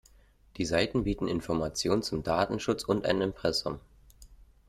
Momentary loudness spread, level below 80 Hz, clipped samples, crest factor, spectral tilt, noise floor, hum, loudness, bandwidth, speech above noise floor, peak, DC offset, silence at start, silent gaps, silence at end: 5 LU; -50 dBFS; under 0.1%; 20 dB; -5 dB/octave; -60 dBFS; none; -30 LUFS; 15 kHz; 30 dB; -12 dBFS; under 0.1%; 0.55 s; none; 0.25 s